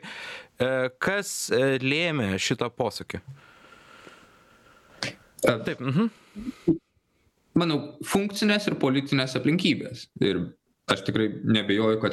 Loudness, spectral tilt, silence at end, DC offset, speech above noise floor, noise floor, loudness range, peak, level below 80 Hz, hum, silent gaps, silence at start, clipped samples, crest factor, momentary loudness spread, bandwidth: -26 LUFS; -5 dB/octave; 0 s; under 0.1%; 43 dB; -68 dBFS; 6 LU; -4 dBFS; -60 dBFS; none; none; 0.05 s; under 0.1%; 22 dB; 13 LU; 15 kHz